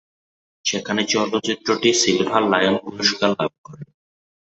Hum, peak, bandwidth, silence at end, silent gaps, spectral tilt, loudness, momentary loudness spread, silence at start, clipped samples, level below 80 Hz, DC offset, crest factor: none; -2 dBFS; 8.2 kHz; 0.65 s; 3.58-3.64 s; -3 dB/octave; -19 LUFS; 7 LU; 0.65 s; under 0.1%; -60 dBFS; under 0.1%; 20 dB